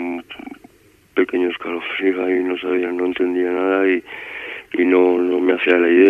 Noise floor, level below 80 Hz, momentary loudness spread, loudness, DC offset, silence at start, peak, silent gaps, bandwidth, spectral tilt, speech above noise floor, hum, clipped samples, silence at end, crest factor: -53 dBFS; -62 dBFS; 15 LU; -19 LUFS; under 0.1%; 0 s; -2 dBFS; none; 3.8 kHz; -6 dB/octave; 36 dB; none; under 0.1%; 0 s; 16 dB